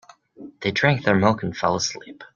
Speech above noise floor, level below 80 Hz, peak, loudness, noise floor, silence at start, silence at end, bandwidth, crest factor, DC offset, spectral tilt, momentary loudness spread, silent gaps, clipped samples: 22 dB; -56 dBFS; -2 dBFS; -21 LUFS; -44 dBFS; 0.4 s; 0.1 s; 7.4 kHz; 20 dB; under 0.1%; -5 dB/octave; 9 LU; none; under 0.1%